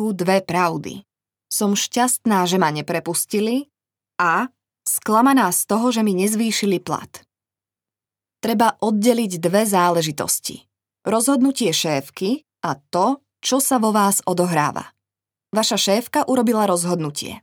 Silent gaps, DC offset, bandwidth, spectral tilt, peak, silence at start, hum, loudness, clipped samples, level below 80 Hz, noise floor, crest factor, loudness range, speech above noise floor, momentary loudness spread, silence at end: none; under 0.1%; over 20 kHz; -4 dB/octave; -2 dBFS; 0 s; none; -19 LUFS; under 0.1%; -68 dBFS; -90 dBFS; 18 dB; 2 LU; 71 dB; 9 LU; 0.05 s